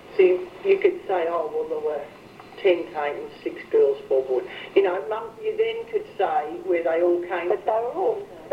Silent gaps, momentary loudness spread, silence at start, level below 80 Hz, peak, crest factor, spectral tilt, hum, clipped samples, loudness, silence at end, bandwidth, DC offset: none; 9 LU; 0 s; -66 dBFS; -6 dBFS; 18 dB; -6 dB/octave; none; under 0.1%; -24 LUFS; 0 s; 6.6 kHz; under 0.1%